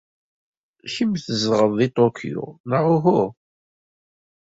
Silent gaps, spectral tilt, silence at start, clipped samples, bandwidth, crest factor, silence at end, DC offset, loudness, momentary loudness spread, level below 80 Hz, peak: 2.60-2.64 s; -6.5 dB/octave; 0.85 s; under 0.1%; 8 kHz; 18 dB; 1.2 s; under 0.1%; -20 LUFS; 13 LU; -62 dBFS; -4 dBFS